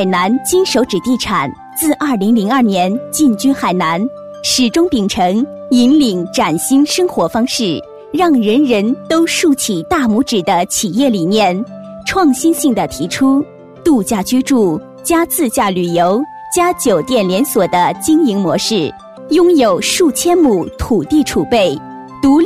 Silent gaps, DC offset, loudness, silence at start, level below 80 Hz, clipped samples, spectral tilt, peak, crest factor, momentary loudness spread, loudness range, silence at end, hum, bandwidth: none; under 0.1%; -13 LUFS; 0 s; -42 dBFS; under 0.1%; -4 dB/octave; -2 dBFS; 10 dB; 6 LU; 1 LU; 0 s; none; 16 kHz